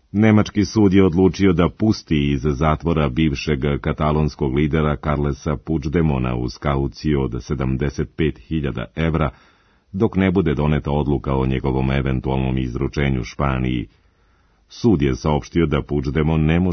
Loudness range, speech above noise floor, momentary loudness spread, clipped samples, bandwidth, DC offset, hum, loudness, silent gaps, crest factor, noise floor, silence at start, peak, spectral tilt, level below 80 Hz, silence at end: 5 LU; 39 dB; 7 LU; under 0.1%; 6.6 kHz; under 0.1%; none; -20 LUFS; none; 18 dB; -58 dBFS; 0.15 s; -2 dBFS; -7.5 dB/octave; -32 dBFS; 0 s